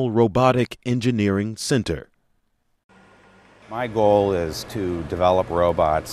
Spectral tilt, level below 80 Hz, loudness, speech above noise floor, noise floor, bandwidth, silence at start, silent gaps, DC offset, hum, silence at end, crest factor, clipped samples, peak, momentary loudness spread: -6 dB/octave; -44 dBFS; -21 LUFS; 47 dB; -67 dBFS; 15 kHz; 0 s; 2.84-2.89 s; under 0.1%; none; 0 s; 18 dB; under 0.1%; -4 dBFS; 10 LU